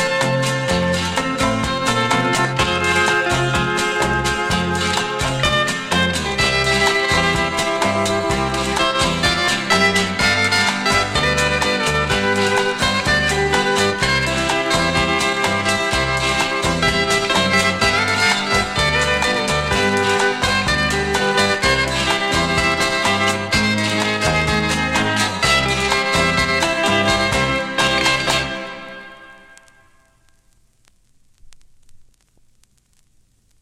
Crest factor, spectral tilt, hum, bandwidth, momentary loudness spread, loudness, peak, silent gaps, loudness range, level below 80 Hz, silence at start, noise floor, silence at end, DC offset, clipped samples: 18 dB; -3.5 dB/octave; none; 16 kHz; 3 LU; -16 LUFS; -2 dBFS; none; 2 LU; -36 dBFS; 0 s; -58 dBFS; 1.6 s; under 0.1%; under 0.1%